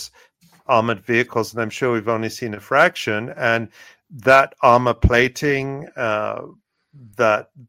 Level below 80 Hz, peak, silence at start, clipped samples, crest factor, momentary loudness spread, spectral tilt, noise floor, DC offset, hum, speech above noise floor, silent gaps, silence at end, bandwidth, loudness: -36 dBFS; 0 dBFS; 0 s; under 0.1%; 20 dB; 13 LU; -5.5 dB/octave; -54 dBFS; under 0.1%; none; 35 dB; none; 0.1 s; 16.5 kHz; -19 LUFS